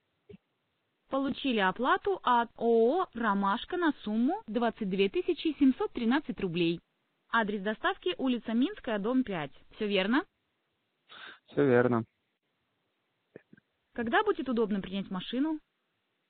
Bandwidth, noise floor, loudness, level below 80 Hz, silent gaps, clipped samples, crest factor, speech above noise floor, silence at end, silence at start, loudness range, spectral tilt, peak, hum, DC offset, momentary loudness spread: 4.6 kHz; -79 dBFS; -30 LUFS; -64 dBFS; none; under 0.1%; 20 dB; 50 dB; 0.7 s; 0.3 s; 5 LU; -4 dB/octave; -10 dBFS; none; under 0.1%; 10 LU